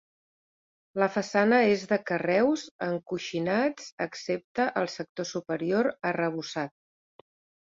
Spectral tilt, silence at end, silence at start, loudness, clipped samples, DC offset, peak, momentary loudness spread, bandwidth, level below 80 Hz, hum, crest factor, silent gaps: -5.5 dB/octave; 1.05 s; 0.95 s; -28 LUFS; under 0.1%; under 0.1%; -10 dBFS; 11 LU; 7.8 kHz; -72 dBFS; none; 20 dB; 2.71-2.79 s, 3.92-3.98 s, 4.44-4.55 s, 5.09-5.15 s